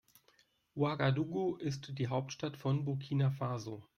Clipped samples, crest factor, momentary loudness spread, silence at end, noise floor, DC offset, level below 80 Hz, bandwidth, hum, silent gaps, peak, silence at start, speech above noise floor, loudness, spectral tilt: under 0.1%; 16 dB; 7 LU; 0.15 s; -71 dBFS; under 0.1%; -70 dBFS; 7 kHz; none; none; -20 dBFS; 0.75 s; 36 dB; -36 LUFS; -7 dB/octave